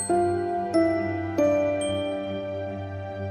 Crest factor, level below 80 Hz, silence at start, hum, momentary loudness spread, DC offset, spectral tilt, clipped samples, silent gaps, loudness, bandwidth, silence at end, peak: 14 dB; -56 dBFS; 0 s; none; 10 LU; under 0.1%; -5.5 dB/octave; under 0.1%; none; -26 LUFS; 13 kHz; 0 s; -12 dBFS